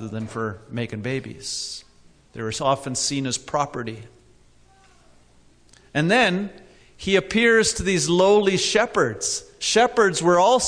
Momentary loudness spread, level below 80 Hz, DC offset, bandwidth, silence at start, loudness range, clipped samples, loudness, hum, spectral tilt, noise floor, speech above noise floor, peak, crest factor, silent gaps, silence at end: 14 LU; -50 dBFS; under 0.1%; 11 kHz; 0 s; 8 LU; under 0.1%; -21 LUFS; none; -3.5 dB/octave; -54 dBFS; 33 dB; -6 dBFS; 16 dB; none; 0 s